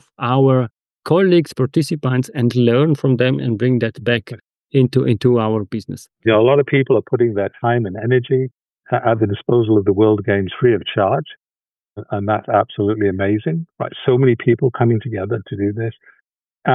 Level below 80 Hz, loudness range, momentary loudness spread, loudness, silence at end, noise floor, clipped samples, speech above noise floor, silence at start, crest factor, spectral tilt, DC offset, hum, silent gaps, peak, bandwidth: -58 dBFS; 3 LU; 10 LU; -17 LUFS; 0 s; under -90 dBFS; under 0.1%; over 74 dB; 0.2 s; 14 dB; -8 dB/octave; under 0.1%; none; 8.78-8.82 s; -2 dBFS; 12 kHz